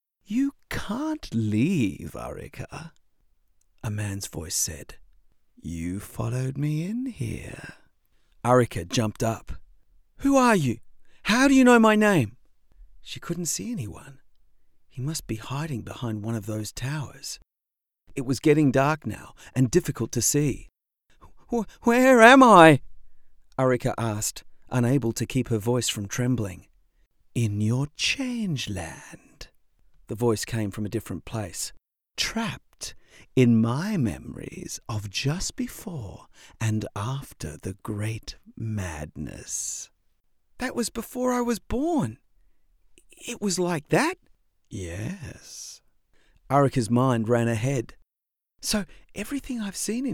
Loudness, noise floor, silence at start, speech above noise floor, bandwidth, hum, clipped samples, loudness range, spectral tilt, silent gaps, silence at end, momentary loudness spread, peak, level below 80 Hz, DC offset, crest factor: -24 LUFS; -87 dBFS; 0.3 s; 63 dB; 17.5 kHz; none; under 0.1%; 14 LU; -5 dB/octave; none; 0 s; 18 LU; 0 dBFS; -50 dBFS; under 0.1%; 26 dB